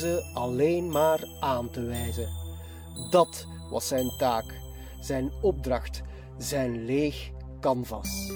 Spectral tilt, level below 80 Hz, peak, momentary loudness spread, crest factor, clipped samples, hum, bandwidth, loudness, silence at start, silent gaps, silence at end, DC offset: -5 dB/octave; -42 dBFS; -10 dBFS; 16 LU; 20 dB; under 0.1%; none; over 20 kHz; -29 LUFS; 0 s; none; 0 s; under 0.1%